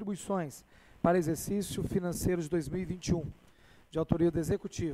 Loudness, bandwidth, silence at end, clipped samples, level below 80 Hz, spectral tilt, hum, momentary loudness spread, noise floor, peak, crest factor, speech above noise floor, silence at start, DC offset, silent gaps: -33 LUFS; 16 kHz; 0 s; under 0.1%; -50 dBFS; -6.5 dB/octave; none; 8 LU; -59 dBFS; -10 dBFS; 22 dB; 27 dB; 0 s; under 0.1%; none